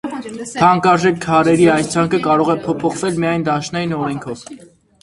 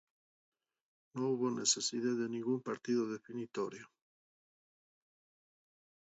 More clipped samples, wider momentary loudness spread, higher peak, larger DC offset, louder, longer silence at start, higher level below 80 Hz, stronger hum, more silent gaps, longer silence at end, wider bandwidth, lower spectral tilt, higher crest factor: neither; about the same, 14 LU vs 12 LU; first, 0 dBFS vs -18 dBFS; neither; first, -15 LUFS vs -36 LUFS; second, 0.05 s vs 1.15 s; first, -50 dBFS vs -88 dBFS; neither; neither; second, 0.45 s vs 2.15 s; first, 11.5 kHz vs 7.6 kHz; first, -5.5 dB/octave vs -4 dB/octave; second, 16 dB vs 22 dB